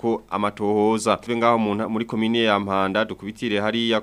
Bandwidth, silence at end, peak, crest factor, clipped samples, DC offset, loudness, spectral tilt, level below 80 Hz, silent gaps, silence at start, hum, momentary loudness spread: 13 kHz; 0 s; -4 dBFS; 18 dB; under 0.1%; under 0.1%; -22 LUFS; -5 dB/octave; -58 dBFS; none; 0.05 s; none; 6 LU